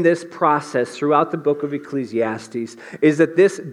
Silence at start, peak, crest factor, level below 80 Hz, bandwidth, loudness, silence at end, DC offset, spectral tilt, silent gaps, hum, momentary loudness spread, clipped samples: 0 s; -2 dBFS; 16 dB; -76 dBFS; 11.5 kHz; -19 LUFS; 0 s; under 0.1%; -6.5 dB/octave; none; none; 11 LU; under 0.1%